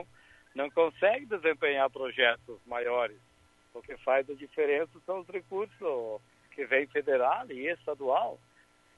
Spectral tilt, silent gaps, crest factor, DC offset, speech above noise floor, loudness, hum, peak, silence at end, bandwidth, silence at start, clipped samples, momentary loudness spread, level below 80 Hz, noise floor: -5 dB/octave; none; 20 dB; under 0.1%; 34 dB; -31 LUFS; none; -12 dBFS; 0.6 s; 9 kHz; 0 s; under 0.1%; 14 LU; -72 dBFS; -64 dBFS